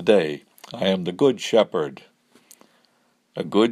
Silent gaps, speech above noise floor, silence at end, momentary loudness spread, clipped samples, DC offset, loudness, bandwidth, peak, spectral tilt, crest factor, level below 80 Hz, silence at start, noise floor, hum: none; 44 dB; 0 s; 16 LU; under 0.1%; under 0.1%; -22 LUFS; 13.5 kHz; -2 dBFS; -5.5 dB/octave; 20 dB; -68 dBFS; 0 s; -65 dBFS; none